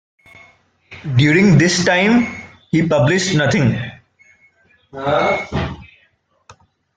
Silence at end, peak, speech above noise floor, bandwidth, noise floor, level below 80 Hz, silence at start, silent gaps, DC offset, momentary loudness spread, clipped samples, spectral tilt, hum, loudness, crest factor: 0.45 s; -2 dBFS; 45 dB; 9.4 kHz; -60 dBFS; -46 dBFS; 0.9 s; none; under 0.1%; 18 LU; under 0.1%; -5.5 dB/octave; none; -15 LUFS; 16 dB